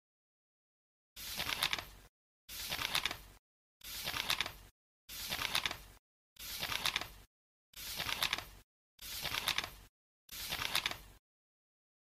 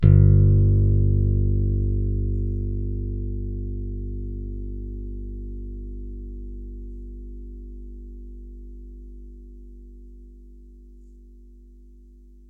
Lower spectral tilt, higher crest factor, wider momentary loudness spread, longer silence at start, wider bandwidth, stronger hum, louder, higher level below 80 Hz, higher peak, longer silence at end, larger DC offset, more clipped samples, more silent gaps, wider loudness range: second, -0.5 dB/octave vs -13 dB/octave; first, 28 dB vs 18 dB; second, 15 LU vs 25 LU; first, 1.15 s vs 0 s; first, 15.5 kHz vs 2.1 kHz; second, none vs 50 Hz at -60 dBFS; second, -38 LUFS vs -23 LUFS; second, -62 dBFS vs -28 dBFS; second, -14 dBFS vs -4 dBFS; first, 0.9 s vs 0.6 s; neither; neither; first, 2.09-2.48 s, 3.39-3.80 s, 4.71-5.08 s, 5.99-6.36 s, 7.27-7.73 s, 8.64-8.98 s, 9.89-10.28 s vs none; second, 2 LU vs 23 LU